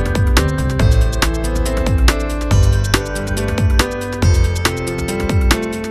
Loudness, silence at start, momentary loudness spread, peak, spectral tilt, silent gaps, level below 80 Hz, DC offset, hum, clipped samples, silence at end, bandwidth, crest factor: -16 LUFS; 0 s; 5 LU; 0 dBFS; -5 dB/octave; none; -18 dBFS; under 0.1%; none; under 0.1%; 0 s; 14 kHz; 14 dB